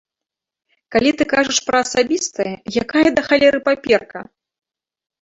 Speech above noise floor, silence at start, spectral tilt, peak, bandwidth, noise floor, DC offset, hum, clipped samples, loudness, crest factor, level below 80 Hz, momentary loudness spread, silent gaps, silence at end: 69 dB; 0.9 s; -3 dB/octave; 0 dBFS; 8.2 kHz; -86 dBFS; under 0.1%; none; under 0.1%; -17 LUFS; 18 dB; -52 dBFS; 9 LU; none; 1 s